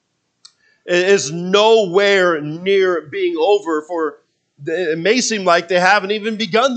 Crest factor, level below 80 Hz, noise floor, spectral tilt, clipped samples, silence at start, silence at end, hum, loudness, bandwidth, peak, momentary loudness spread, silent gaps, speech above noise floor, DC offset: 16 dB; -74 dBFS; -51 dBFS; -3.5 dB/octave; under 0.1%; 0.85 s; 0 s; none; -16 LUFS; 9 kHz; 0 dBFS; 9 LU; none; 35 dB; under 0.1%